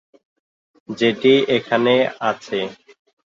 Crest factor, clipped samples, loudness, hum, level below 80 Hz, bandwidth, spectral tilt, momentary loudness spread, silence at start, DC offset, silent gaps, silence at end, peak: 16 dB; under 0.1%; -18 LUFS; none; -66 dBFS; 7.6 kHz; -5.5 dB/octave; 11 LU; 0.9 s; under 0.1%; none; 0.6 s; -4 dBFS